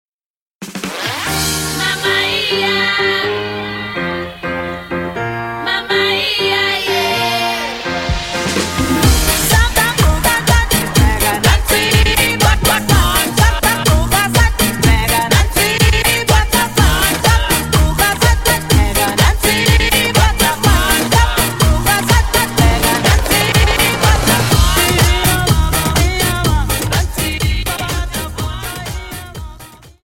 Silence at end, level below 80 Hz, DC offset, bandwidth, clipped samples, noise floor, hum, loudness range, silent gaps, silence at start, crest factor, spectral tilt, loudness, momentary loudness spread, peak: 0.15 s; -20 dBFS; under 0.1%; 16.5 kHz; under 0.1%; -51 dBFS; none; 5 LU; none; 0.6 s; 14 dB; -3.5 dB/octave; -13 LUFS; 10 LU; 0 dBFS